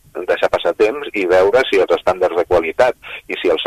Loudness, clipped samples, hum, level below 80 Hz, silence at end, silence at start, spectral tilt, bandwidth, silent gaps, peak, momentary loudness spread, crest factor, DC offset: -16 LUFS; under 0.1%; none; -46 dBFS; 0 s; 0.15 s; -4.5 dB/octave; 14 kHz; none; 0 dBFS; 8 LU; 14 dB; under 0.1%